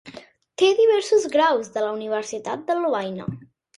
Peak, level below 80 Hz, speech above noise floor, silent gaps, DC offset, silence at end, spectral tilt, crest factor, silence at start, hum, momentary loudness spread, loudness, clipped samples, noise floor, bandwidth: -6 dBFS; -64 dBFS; 23 dB; none; under 0.1%; 0.35 s; -4 dB/octave; 16 dB; 0.05 s; none; 15 LU; -21 LUFS; under 0.1%; -44 dBFS; 11.5 kHz